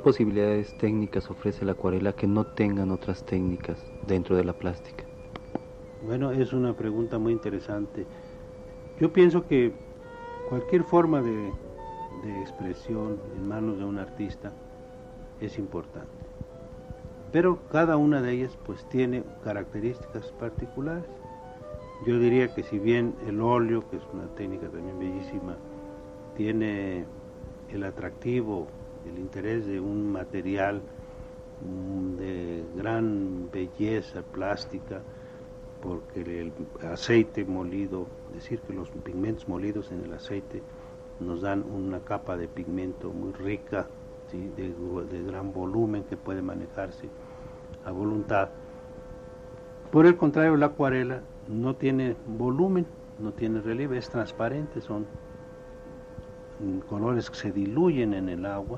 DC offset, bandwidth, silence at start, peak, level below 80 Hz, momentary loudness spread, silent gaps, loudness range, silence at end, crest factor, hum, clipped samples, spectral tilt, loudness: under 0.1%; 8 kHz; 0 s; -8 dBFS; -50 dBFS; 20 LU; none; 9 LU; 0 s; 22 dB; none; under 0.1%; -8 dB/octave; -29 LUFS